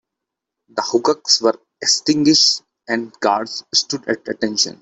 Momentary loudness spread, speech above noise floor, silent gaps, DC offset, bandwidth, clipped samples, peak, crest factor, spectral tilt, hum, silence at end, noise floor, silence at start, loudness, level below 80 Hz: 11 LU; 64 dB; none; under 0.1%; 8.4 kHz; under 0.1%; -2 dBFS; 18 dB; -2 dB/octave; none; 0.1 s; -82 dBFS; 0.75 s; -17 LUFS; -62 dBFS